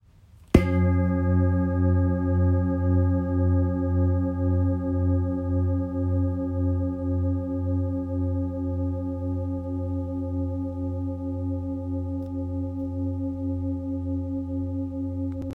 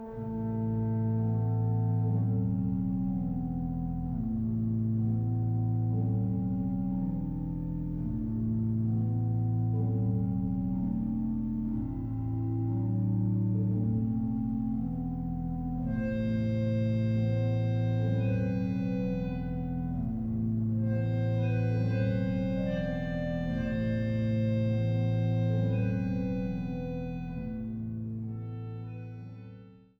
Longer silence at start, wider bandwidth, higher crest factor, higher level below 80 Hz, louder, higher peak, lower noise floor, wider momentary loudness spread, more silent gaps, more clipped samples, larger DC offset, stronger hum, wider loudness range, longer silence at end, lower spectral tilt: first, 0.55 s vs 0 s; second, 3.5 kHz vs 5 kHz; first, 24 dB vs 12 dB; about the same, -44 dBFS vs -46 dBFS; first, -26 LUFS vs -31 LUFS; first, -2 dBFS vs -18 dBFS; about the same, -52 dBFS vs -51 dBFS; about the same, 8 LU vs 6 LU; neither; neither; neither; neither; first, 7 LU vs 2 LU; second, 0 s vs 0.25 s; about the same, -10.5 dB/octave vs -10.5 dB/octave